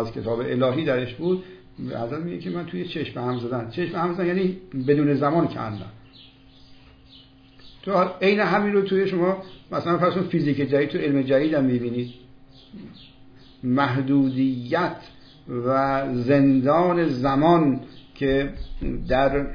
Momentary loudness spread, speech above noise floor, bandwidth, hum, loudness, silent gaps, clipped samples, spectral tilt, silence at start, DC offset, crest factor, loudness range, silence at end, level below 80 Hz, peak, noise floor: 13 LU; 28 dB; 5.2 kHz; none; -23 LUFS; none; under 0.1%; -9 dB/octave; 0 s; under 0.1%; 18 dB; 6 LU; 0 s; -44 dBFS; -6 dBFS; -50 dBFS